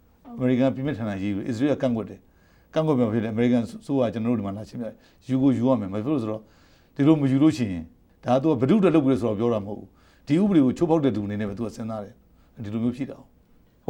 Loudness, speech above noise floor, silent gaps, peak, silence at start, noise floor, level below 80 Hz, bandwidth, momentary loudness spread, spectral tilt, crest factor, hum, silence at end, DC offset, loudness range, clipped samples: -24 LUFS; 34 dB; none; -6 dBFS; 0.25 s; -57 dBFS; -56 dBFS; 10.5 kHz; 16 LU; -8.5 dB/octave; 18 dB; none; 0.65 s; under 0.1%; 4 LU; under 0.1%